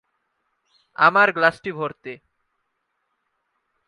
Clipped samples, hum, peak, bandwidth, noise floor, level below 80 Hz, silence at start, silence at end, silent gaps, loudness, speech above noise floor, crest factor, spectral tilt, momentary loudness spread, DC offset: under 0.1%; none; -2 dBFS; 11 kHz; -75 dBFS; -70 dBFS; 1 s; 1.75 s; none; -19 LUFS; 55 dB; 24 dB; -5.5 dB/octave; 23 LU; under 0.1%